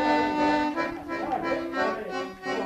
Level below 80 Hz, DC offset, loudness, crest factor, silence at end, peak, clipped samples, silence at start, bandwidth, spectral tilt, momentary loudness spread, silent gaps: -56 dBFS; under 0.1%; -27 LUFS; 16 dB; 0 s; -12 dBFS; under 0.1%; 0 s; 13.5 kHz; -5 dB/octave; 8 LU; none